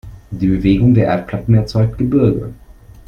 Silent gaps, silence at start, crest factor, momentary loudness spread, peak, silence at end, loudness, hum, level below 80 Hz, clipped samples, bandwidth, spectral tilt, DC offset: none; 0.05 s; 14 dB; 10 LU; 0 dBFS; 0.35 s; -15 LUFS; none; -32 dBFS; under 0.1%; 6.6 kHz; -9.5 dB/octave; under 0.1%